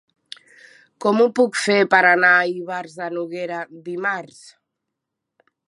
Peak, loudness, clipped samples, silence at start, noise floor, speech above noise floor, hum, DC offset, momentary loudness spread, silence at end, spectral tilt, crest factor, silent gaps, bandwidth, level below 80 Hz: -2 dBFS; -18 LUFS; under 0.1%; 1 s; -81 dBFS; 62 dB; none; under 0.1%; 16 LU; 1.4 s; -4 dB/octave; 20 dB; none; 11.5 kHz; -78 dBFS